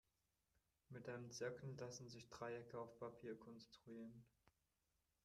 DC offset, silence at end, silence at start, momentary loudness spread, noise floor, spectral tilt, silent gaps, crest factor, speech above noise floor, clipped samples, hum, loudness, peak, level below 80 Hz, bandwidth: under 0.1%; 0.75 s; 0.9 s; 11 LU; -89 dBFS; -5 dB/octave; none; 20 dB; 34 dB; under 0.1%; none; -55 LUFS; -36 dBFS; -84 dBFS; 13 kHz